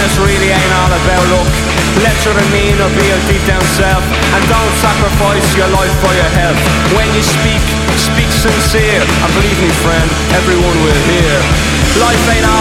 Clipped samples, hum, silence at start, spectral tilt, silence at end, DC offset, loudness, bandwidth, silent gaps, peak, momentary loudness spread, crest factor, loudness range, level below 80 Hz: 0.1%; none; 0 s; -4.5 dB/octave; 0 s; under 0.1%; -10 LUFS; 16.5 kHz; none; 0 dBFS; 2 LU; 10 dB; 0 LU; -18 dBFS